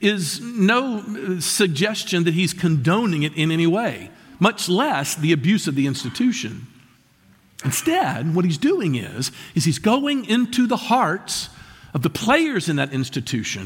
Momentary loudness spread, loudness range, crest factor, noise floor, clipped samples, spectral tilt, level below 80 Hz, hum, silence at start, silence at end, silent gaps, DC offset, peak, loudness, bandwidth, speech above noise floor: 8 LU; 3 LU; 18 dB; -55 dBFS; under 0.1%; -4.5 dB/octave; -58 dBFS; none; 0 s; 0 s; none; under 0.1%; -4 dBFS; -21 LUFS; 17 kHz; 35 dB